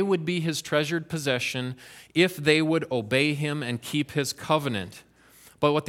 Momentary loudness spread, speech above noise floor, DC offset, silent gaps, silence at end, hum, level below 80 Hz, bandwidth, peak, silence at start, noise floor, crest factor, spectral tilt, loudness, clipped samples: 9 LU; 29 dB; under 0.1%; none; 0 s; none; -64 dBFS; 16.5 kHz; -6 dBFS; 0 s; -55 dBFS; 22 dB; -5 dB/octave; -26 LUFS; under 0.1%